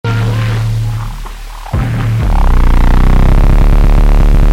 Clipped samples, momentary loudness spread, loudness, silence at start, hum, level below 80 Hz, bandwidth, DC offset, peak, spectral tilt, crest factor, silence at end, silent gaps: under 0.1%; 10 LU; -12 LUFS; 0.05 s; none; -8 dBFS; 7.8 kHz; under 0.1%; 0 dBFS; -7 dB/octave; 8 dB; 0 s; none